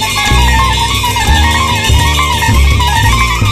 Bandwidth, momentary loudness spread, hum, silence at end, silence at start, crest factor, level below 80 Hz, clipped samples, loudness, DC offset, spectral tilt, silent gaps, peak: 14.5 kHz; 1 LU; none; 0 s; 0 s; 10 dB; -14 dBFS; under 0.1%; -9 LUFS; under 0.1%; -3.5 dB/octave; none; 0 dBFS